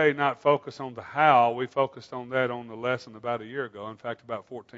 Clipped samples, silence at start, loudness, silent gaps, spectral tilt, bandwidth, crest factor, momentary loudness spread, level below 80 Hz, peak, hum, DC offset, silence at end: under 0.1%; 0 s; -27 LUFS; none; -6.5 dB/octave; 7.8 kHz; 22 dB; 16 LU; -74 dBFS; -6 dBFS; none; under 0.1%; 0 s